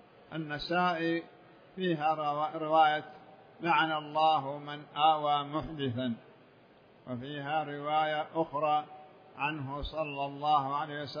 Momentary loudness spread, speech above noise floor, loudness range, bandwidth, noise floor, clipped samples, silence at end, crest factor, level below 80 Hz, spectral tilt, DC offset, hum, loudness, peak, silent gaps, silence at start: 13 LU; 28 dB; 5 LU; 5.2 kHz; -60 dBFS; under 0.1%; 0 s; 18 dB; -58 dBFS; -7 dB/octave; under 0.1%; none; -31 LUFS; -14 dBFS; none; 0.3 s